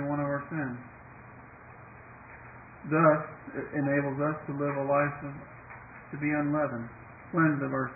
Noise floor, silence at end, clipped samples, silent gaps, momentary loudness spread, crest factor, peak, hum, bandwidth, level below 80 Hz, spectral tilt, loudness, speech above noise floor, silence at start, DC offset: -50 dBFS; 0 s; under 0.1%; none; 23 LU; 22 dB; -10 dBFS; none; 2.7 kHz; -62 dBFS; -14 dB/octave; -29 LUFS; 21 dB; 0 s; under 0.1%